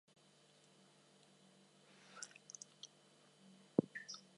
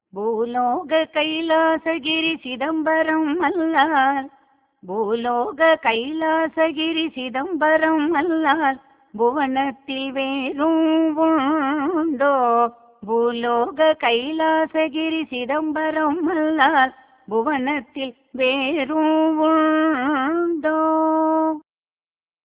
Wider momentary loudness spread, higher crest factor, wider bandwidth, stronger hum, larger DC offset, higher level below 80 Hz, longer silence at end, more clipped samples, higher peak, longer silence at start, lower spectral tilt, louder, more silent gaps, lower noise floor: first, 27 LU vs 8 LU; first, 34 dB vs 18 dB; first, 11.5 kHz vs 4 kHz; neither; neither; second, -88 dBFS vs -64 dBFS; second, 0.15 s vs 0.85 s; neither; second, -16 dBFS vs -2 dBFS; first, 2.05 s vs 0.15 s; second, -4.5 dB/octave vs -7.5 dB/octave; second, -46 LUFS vs -20 LUFS; neither; second, -70 dBFS vs under -90 dBFS